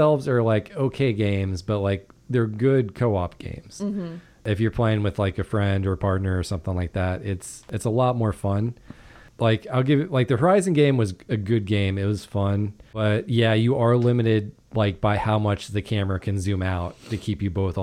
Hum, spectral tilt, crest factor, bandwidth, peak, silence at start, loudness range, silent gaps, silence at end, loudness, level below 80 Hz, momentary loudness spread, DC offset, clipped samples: none; -7 dB/octave; 16 dB; 11.5 kHz; -8 dBFS; 0 s; 3 LU; none; 0 s; -24 LUFS; -46 dBFS; 10 LU; under 0.1%; under 0.1%